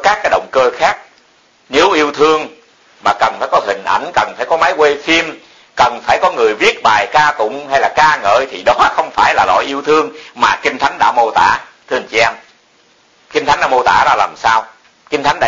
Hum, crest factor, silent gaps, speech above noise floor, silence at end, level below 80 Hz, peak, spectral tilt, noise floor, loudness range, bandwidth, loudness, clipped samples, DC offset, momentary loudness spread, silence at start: none; 14 dB; none; 38 dB; 0 s; -46 dBFS; 0 dBFS; -3 dB/octave; -51 dBFS; 3 LU; 7.8 kHz; -12 LUFS; under 0.1%; under 0.1%; 7 LU; 0 s